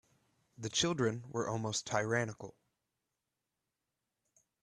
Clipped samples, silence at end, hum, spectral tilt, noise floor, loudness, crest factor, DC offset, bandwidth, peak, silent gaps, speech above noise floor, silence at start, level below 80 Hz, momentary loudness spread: under 0.1%; 2.15 s; none; -3.5 dB/octave; -88 dBFS; -35 LUFS; 22 dB; under 0.1%; 12 kHz; -16 dBFS; none; 53 dB; 0.6 s; -72 dBFS; 13 LU